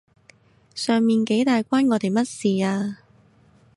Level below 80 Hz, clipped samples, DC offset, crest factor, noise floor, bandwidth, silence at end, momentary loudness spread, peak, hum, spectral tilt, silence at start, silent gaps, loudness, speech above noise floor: -68 dBFS; under 0.1%; under 0.1%; 14 dB; -56 dBFS; 11.5 kHz; 0.8 s; 11 LU; -8 dBFS; none; -5.5 dB/octave; 0.75 s; none; -21 LUFS; 35 dB